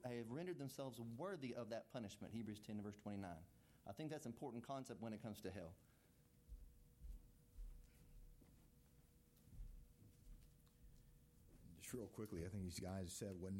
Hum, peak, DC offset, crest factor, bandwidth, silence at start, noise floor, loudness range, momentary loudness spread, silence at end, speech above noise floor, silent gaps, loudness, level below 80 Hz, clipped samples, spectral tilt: none; -36 dBFS; under 0.1%; 18 dB; 16.5 kHz; 0 s; -73 dBFS; 16 LU; 18 LU; 0 s; 22 dB; none; -53 LUFS; -66 dBFS; under 0.1%; -5.5 dB/octave